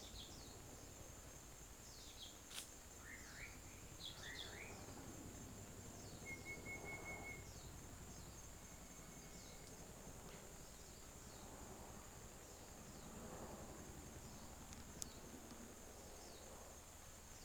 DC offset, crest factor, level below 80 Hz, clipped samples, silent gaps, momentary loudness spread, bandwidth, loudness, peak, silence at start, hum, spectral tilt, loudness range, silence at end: under 0.1%; 32 dB; -64 dBFS; under 0.1%; none; 6 LU; over 20 kHz; -55 LUFS; -24 dBFS; 0 s; none; -3 dB/octave; 4 LU; 0 s